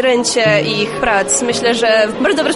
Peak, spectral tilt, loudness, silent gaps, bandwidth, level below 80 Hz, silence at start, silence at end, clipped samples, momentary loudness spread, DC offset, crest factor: 0 dBFS; -3 dB/octave; -13 LUFS; none; 11.5 kHz; -44 dBFS; 0 s; 0 s; under 0.1%; 3 LU; under 0.1%; 12 dB